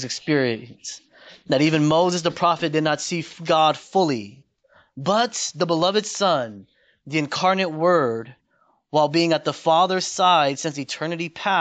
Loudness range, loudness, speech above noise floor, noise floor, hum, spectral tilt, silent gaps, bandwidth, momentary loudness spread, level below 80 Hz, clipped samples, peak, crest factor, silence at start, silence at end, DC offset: 3 LU; -21 LUFS; 43 dB; -64 dBFS; none; -4 dB/octave; none; 9.2 kHz; 10 LU; -66 dBFS; under 0.1%; -6 dBFS; 16 dB; 0 s; 0 s; under 0.1%